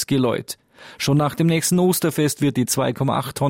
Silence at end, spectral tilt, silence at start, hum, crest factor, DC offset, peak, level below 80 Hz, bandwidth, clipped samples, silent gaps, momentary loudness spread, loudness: 0 s; -5 dB/octave; 0 s; none; 14 dB; under 0.1%; -6 dBFS; -54 dBFS; 16.5 kHz; under 0.1%; none; 8 LU; -20 LUFS